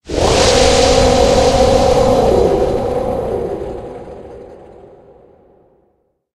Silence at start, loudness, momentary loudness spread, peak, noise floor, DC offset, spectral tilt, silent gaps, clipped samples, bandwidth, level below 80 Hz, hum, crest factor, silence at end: 0.05 s; -12 LUFS; 20 LU; 0 dBFS; -61 dBFS; under 0.1%; -4.5 dB/octave; none; under 0.1%; 12.5 kHz; -26 dBFS; none; 14 dB; 1.8 s